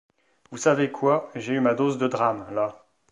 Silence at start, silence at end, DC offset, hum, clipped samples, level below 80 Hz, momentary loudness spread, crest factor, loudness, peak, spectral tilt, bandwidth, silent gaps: 0.5 s; 0.35 s; under 0.1%; none; under 0.1%; -68 dBFS; 7 LU; 18 dB; -24 LUFS; -6 dBFS; -5.5 dB/octave; 11 kHz; none